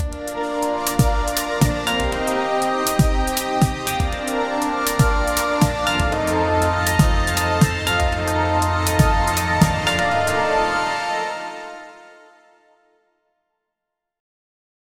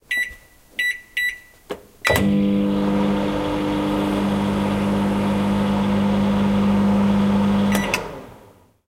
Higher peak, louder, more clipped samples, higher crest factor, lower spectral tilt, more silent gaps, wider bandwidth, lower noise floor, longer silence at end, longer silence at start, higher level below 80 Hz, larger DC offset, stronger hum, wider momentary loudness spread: about the same, 0 dBFS vs -2 dBFS; about the same, -19 LUFS vs -20 LUFS; neither; about the same, 20 dB vs 20 dB; second, -4.5 dB/octave vs -6 dB/octave; neither; first, 19.5 kHz vs 16 kHz; first, -82 dBFS vs -50 dBFS; first, 2.9 s vs 0.5 s; about the same, 0 s vs 0.1 s; first, -28 dBFS vs -40 dBFS; neither; neither; about the same, 6 LU vs 7 LU